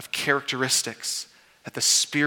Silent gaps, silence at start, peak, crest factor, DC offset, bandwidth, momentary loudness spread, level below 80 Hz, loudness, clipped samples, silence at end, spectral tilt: none; 0 s; -6 dBFS; 20 dB; under 0.1%; 19 kHz; 14 LU; -72 dBFS; -23 LUFS; under 0.1%; 0 s; -1 dB/octave